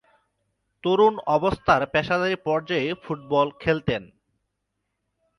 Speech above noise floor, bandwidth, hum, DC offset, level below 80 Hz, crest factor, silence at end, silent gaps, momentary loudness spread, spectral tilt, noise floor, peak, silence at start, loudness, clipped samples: 56 dB; 10.5 kHz; none; under 0.1%; -52 dBFS; 20 dB; 1.35 s; none; 9 LU; -6.5 dB/octave; -78 dBFS; -6 dBFS; 0.85 s; -23 LUFS; under 0.1%